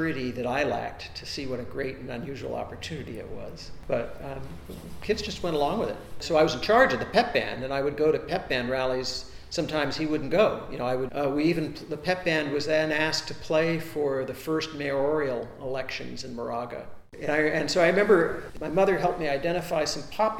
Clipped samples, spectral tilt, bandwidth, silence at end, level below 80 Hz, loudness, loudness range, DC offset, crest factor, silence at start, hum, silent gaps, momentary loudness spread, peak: under 0.1%; -5 dB/octave; 17 kHz; 0 s; -48 dBFS; -27 LUFS; 9 LU; under 0.1%; 22 dB; 0 s; none; none; 14 LU; -6 dBFS